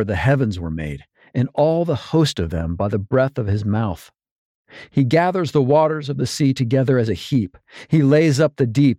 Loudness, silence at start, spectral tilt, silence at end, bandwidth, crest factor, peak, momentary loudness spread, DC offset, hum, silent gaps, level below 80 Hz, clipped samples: -19 LUFS; 0 s; -7 dB/octave; 0.05 s; 14 kHz; 14 dB; -4 dBFS; 11 LU; under 0.1%; none; 4.31-4.65 s; -42 dBFS; under 0.1%